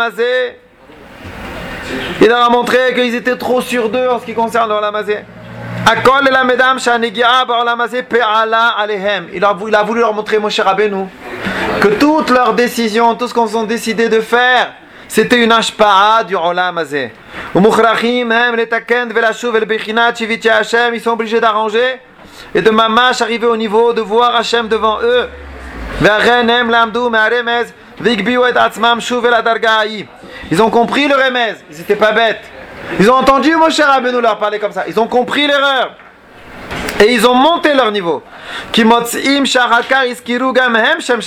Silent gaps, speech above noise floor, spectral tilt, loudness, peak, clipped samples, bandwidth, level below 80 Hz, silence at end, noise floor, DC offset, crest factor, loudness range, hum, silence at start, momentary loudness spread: none; 26 dB; -4 dB/octave; -12 LUFS; 0 dBFS; under 0.1%; 16 kHz; -42 dBFS; 0 s; -38 dBFS; under 0.1%; 12 dB; 2 LU; none; 0 s; 12 LU